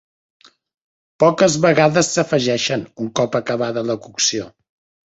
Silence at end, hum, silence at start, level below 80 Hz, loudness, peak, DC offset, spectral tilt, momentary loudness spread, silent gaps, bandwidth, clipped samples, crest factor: 0.6 s; none; 1.2 s; -58 dBFS; -17 LUFS; -2 dBFS; under 0.1%; -4 dB/octave; 10 LU; none; 8.2 kHz; under 0.1%; 18 dB